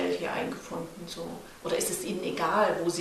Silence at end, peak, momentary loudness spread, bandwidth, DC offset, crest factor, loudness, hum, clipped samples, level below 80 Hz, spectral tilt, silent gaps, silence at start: 0 s; -12 dBFS; 13 LU; 14.5 kHz; under 0.1%; 18 dB; -31 LUFS; none; under 0.1%; -62 dBFS; -3.5 dB/octave; none; 0 s